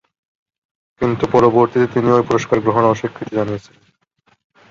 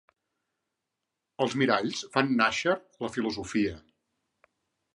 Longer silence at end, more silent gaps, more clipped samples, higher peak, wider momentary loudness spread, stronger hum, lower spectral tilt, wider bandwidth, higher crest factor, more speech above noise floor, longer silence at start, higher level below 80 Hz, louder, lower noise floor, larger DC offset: about the same, 1.1 s vs 1.15 s; neither; neither; first, -2 dBFS vs -6 dBFS; about the same, 9 LU vs 8 LU; neither; first, -7 dB/octave vs -4.5 dB/octave; second, 7.4 kHz vs 11 kHz; second, 16 dB vs 24 dB; second, 45 dB vs 57 dB; second, 1 s vs 1.4 s; first, -50 dBFS vs -62 dBFS; first, -16 LUFS vs -28 LUFS; second, -61 dBFS vs -85 dBFS; neither